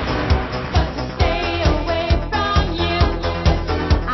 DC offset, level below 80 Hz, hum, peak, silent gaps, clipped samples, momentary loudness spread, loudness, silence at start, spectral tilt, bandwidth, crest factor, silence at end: under 0.1%; -22 dBFS; none; -2 dBFS; none; under 0.1%; 2 LU; -19 LUFS; 0 s; -6.5 dB/octave; 6.2 kHz; 16 dB; 0 s